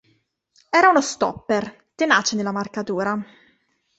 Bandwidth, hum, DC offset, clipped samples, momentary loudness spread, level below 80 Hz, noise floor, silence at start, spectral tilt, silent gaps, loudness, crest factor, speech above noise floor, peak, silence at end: 8.2 kHz; none; under 0.1%; under 0.1%; 12 LU; -62 dBFS; -65 dBFS; 0.75 s; -3.5 dB/octave; none; -20 LUFS; 20 dB; 45 dB; -2 dBFS; 0.75 s